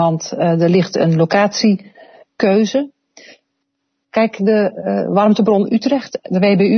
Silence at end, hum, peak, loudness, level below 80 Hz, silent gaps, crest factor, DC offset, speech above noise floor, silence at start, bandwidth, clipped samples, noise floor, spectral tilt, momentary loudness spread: 0 s; none; 0 dBFS; -15 LUFS; -62 dBFS; none; 14 dB; under 0.1%; 58 dB; 0 s; 6.6 kHz; under 0.1%; -72 dBFS; -6.5 dB/octave; 7 LU